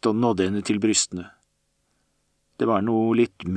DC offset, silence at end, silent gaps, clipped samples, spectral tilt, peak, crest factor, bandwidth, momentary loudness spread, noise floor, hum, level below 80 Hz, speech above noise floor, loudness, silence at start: under 0.1%; 0 s; none; under 0.1%; -4.5 dB/octave; -8 dBFS; 16 dB; 9.8 kHz; 7 LU; -71 dBFS; none; -60 dBFS; 49 dB; -22 LUFS; 0 s